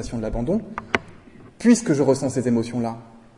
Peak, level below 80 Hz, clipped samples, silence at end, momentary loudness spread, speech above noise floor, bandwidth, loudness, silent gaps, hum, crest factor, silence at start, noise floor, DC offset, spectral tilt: 0 dBFS; -42 dBFS; under 0.1%; 0.2 s; 10 LU; 24 dB; 11.5 kHz; -22 LUFS; none; none; 22 dB; 0 s; -45 dBFS; under 0.1%; -5.5 dB/octave